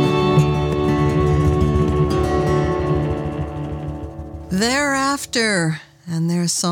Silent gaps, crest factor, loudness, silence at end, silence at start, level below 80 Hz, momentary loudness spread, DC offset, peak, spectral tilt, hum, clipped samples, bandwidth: none; 16 dB; -19 LUFS; 0 s; 0 s; -30 dBFS; 11 LU; under 0.1%; -4 dBFS; -5.5 dB/octave; none; under 0.1%; 16.5 kHz